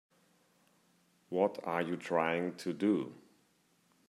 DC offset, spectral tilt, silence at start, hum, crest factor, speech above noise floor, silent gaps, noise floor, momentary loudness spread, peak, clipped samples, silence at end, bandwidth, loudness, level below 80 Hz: under 0.1%; -6.5 dB/octave; 1.3 s; none; 22 dB; 38 dB; none; -72 dBFS; 6 LU; -16 dBFS; under 0.1%; 0.9 s; 14 kHz; -35 LUFS; -82 dBFS